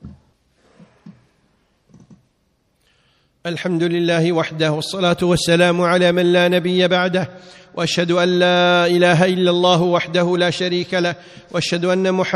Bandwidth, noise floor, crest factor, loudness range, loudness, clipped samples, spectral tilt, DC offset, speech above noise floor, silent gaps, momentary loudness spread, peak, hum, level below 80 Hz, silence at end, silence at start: 12.5 kHz; -64 dBFS; 18 dB; 8 LU; -16 LUFS; under 0.1%; -5.5 dB/octave; under 0.1%; 48 dB; none; 9 LU; 0 dBFS; none; -54 dBFS; 0 s; 0.05 s